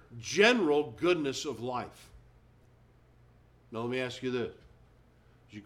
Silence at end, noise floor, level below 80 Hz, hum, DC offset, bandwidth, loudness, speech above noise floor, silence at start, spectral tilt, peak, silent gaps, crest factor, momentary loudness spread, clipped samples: 0 s; -61 dBFS; -64 dBFS; none; under 0.1%; 14.5 kHz; -30 LUFS; 31 dB; 0.1 s; -4 dB/octave; -10 dBFS; none; 24 dB; 17 LU; under 0.1%